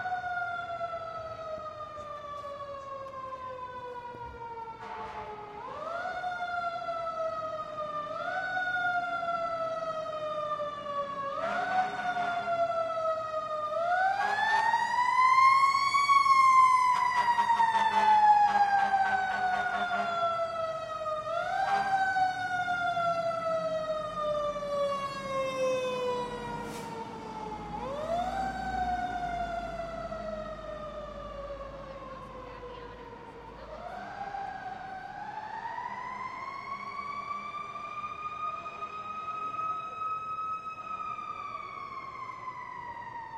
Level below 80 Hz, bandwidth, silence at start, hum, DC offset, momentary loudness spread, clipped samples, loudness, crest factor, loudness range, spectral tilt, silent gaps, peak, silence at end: -58 dBFS; 14 kHz; 0 s; none; under 0.1%; 17 LU; under 0.1%; -30 LUFS; 18 dB; 17 LU; -3.5 dB/octave; none; -12 dBFS; 0 s